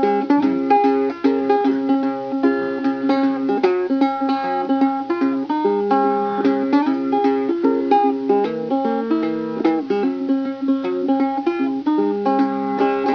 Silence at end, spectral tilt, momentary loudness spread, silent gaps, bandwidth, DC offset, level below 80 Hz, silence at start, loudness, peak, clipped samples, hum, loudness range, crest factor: 0 s; -7.5 dB/octave; 4 LU; none; 5.4 kHz; under 0.1%; -68 dBFS; 0 s; -19 LUFS; -2 dBFS; under 0.1%; none; 2 LU; 16 dB